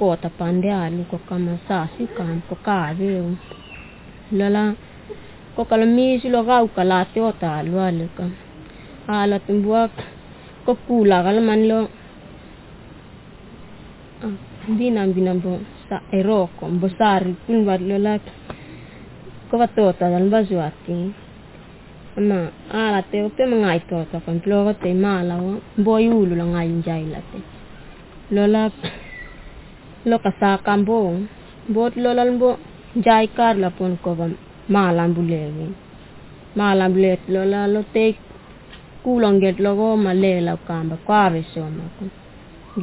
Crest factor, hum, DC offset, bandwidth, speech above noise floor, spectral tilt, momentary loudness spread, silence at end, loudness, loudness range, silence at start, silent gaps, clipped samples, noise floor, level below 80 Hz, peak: 18 dB; none; under 0.1%; 4 kHz; 23 dB; -11.5 dB/octave; 18 LU; 0 s; -20 LUFS; 5 LU; 0 s; none; under 0.1%; -42 dBFS; -48 dBFS; -2 dBFS